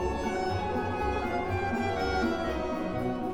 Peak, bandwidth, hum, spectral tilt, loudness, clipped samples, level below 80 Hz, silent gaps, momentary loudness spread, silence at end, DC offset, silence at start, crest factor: -16 dBFS; 17.5 kHz; none; -6.5 dB/octave; -30 LUFS; under 0.1%; -42 dBFS; none; 3 LU; 0 s; 0.4%; 0 s; 12 dB